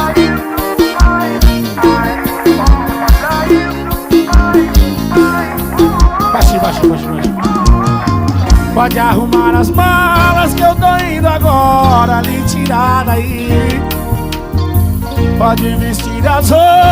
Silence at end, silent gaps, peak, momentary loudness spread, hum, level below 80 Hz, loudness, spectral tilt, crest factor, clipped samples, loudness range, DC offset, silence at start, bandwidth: 0 s; none; 0 dBFS; 6 LU; none; -16 dBFS; -11 LUFS; -6 dB/octave; 10 dB; 0.3%; 3 LU; under 0.1%; 0 s; 16.5 kHz